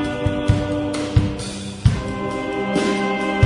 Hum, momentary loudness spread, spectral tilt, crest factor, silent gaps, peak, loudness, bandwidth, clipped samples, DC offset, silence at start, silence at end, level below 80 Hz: none; 5 LU; -6.5 dB/octave; 18 dB; none; -2 dBFS; -21 LUFS; 11 kHz; under 0.1%; under 0.1%; 0 s; 0 s; -32 dBFS